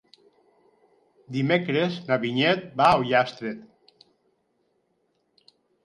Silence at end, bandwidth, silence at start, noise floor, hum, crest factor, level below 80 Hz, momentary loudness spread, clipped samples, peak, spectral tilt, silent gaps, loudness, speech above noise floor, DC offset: 2.2 s; 11.5 kHz; 1.3 s; -71 dBFS; none; 22 dB; -62 dBFS; 14 LU; under 0.1%; -6 dBFS; -6.5 dB/octave; none; -23 LUFS; 48 dB; under 0.1%